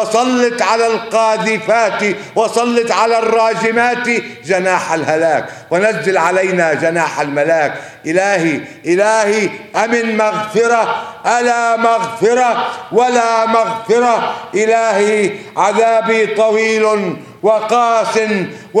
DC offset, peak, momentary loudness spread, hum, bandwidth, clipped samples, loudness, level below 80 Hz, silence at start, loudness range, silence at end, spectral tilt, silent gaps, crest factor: under 0.1%; 0 dBFS; 6 LU; none; 13.5 kHz; under 0.1%; -14 LUFS; -64 dBFS; 0 s; 1 LU; 0 s; -4 dB/octave; none; 14 dB